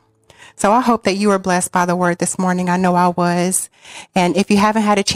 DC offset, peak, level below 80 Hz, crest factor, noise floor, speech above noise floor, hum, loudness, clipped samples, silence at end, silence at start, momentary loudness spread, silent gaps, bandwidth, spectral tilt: under 0.1%; -2 dBFS; -50 dBFS; 14 dB; -46 dBFS; 30 dB; none; -16 LUFS; under 0.1%; 0 s; 0.6 s; 5 LU; none; 16 kHz; -4.5 dB/octave